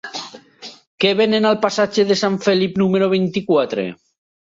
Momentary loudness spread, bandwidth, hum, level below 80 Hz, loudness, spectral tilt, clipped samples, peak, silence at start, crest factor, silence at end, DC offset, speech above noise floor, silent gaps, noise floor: 21 LU; 7.8 kHz; none; -60 dBFS; -17 LUFS; -5.5 dB/octave; under 0.1%; -2 dBFS; 0.05 s; 16 dB; 0.6 s; under 0.1%; 24 dB; 0.87-0.98 s; -40 dBFS